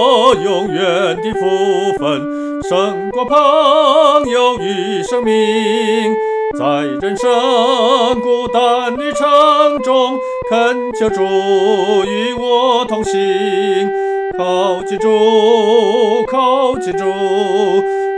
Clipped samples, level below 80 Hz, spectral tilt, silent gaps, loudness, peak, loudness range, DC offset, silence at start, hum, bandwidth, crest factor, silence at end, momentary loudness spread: under 0.1%; -48 dBFS; -4.5 dB/octave; none; -13 LUFS; 0 dBFS; 2 LU; under 0.1%; 0 s; none; 10.5 kHz; 12 dB; 0 s; 7 LU